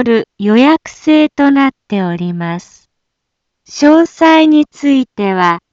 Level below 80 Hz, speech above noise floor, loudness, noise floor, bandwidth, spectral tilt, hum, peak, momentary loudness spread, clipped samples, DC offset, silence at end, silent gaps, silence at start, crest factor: -56 dBFS; 62 dB; -11 LUFS; -73 dBFS; 7.6 kHz; -6 dB/octave; none; 0 dBFS; 10 LU; under 0.1%; under 0.1%; 0.15 s; none; 0 s; 12 dB